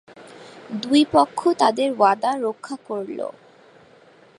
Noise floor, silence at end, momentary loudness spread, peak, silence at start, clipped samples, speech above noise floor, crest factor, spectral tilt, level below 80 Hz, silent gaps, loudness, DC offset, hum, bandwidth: -51 dBFS; 1.05 s; 16 LU; -2 dBFS; 0.2 s; under 0.1%; 31 dB; 20 dB; -4.5 dB/octave; -64 dBFS; none; -20 LUFS; under 0.1%; none; 11.5 kHz